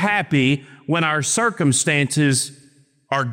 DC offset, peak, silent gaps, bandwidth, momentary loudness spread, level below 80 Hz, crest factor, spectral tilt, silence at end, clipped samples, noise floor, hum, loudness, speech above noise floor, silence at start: under 0.1%; -6 dBFS; none; 16.5 kHz; 7 LU; -64 dBFS; 14 dB; -4 dB/octave; 0 s; under 0.1%; -54 dBFS; none; -19 LUFS; 35 dB; 0 s